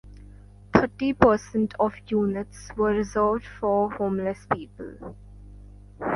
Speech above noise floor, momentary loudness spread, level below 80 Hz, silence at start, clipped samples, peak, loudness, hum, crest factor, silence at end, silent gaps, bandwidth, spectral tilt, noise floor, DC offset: 22 dB; 17 LU; -46 dBFS; 0.05 s; under 0.1%; 0 dBFS; -25 LUFS; 50 Hz at -45 dBFS; 24 dB; 0 s; none; 11.5 kHz; -7 dB/octave; -47 dBFS; under 0.1%